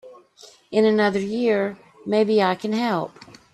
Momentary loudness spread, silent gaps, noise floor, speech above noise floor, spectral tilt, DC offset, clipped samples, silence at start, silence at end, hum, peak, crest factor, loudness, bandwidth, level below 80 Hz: 10 LU; none; -50 dBFS; 30 dB; -6 dB/octave; under 0.1%; under 0.1%; 0.05 s; 0.3 s; none; -6 dBFS; 16 dB; -21 LUFS; 12 kHz; -66 dBFS